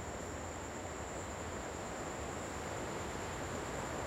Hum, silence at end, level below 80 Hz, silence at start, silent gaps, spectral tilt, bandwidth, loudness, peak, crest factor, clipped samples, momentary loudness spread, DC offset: none; 0 s; -54 dBFS; 0 s; none; -4 dB/octave; 16.5 kHz; -42 LUFS; -28 dBFS; 14 dB; under 0.1%; 3 LU; under 0.1%